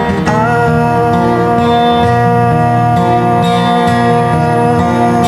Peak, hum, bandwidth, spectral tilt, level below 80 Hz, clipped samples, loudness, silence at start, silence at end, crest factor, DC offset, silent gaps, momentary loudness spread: 0 dBFS; 60 Hz at -30 dBFS; 13 kHz; -7 dB/octave; -36 dBFS; under 0.1%; -10 LUFS; 0 s; 0 s; 10 dB; under 0.1%; none; 1 LU